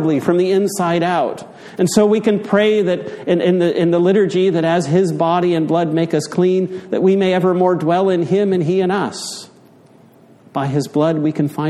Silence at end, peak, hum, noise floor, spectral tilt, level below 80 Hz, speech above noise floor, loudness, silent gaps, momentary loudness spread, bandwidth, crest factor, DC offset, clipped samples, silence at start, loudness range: 0 s; 0 dBFS; none; -46 dBFS; -6.5 dB/octave; -60 dBFS; 31 dB; -16 LUFS; none; 7 LU; 13 kHz; 16 dB; under 0.1%; under 0.1%; 0 s; 4 LU